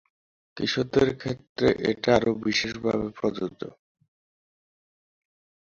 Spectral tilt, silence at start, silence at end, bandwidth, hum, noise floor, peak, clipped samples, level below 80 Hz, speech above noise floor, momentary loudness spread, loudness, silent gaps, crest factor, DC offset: -5 dB/octave; 0.55 s; 2 s; 7.6 kHz; none; under -90 dBFS; -6 dBFS; under 0.1%; -54 dBFS; over 65 dB; 11 LU; -26 LUFS; 1.49-1.56 s; 22 dB; under 0.1%